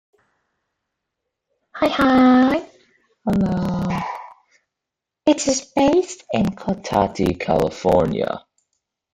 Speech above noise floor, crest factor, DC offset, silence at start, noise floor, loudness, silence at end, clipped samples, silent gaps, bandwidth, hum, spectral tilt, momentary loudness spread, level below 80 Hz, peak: 66 dB; 18 dB; under 0.1%; 1.75 s; -84 dBFS; -19 LUFS; 0.75 s; under 0.1%; none; 14.5 kHz; none; -5.5 dB/octave; 12 LU; -46 dBFS; -2 dBFS